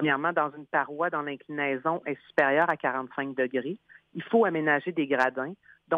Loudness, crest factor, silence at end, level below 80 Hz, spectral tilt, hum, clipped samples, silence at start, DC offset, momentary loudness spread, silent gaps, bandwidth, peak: -27 LUFS; 18 dB; 0 s; -76 dBFS; -7 dB/octave; none; under 0.1%; 0 s; under 0.1%; 11 LU; none; 8 kHz; -10 dBFS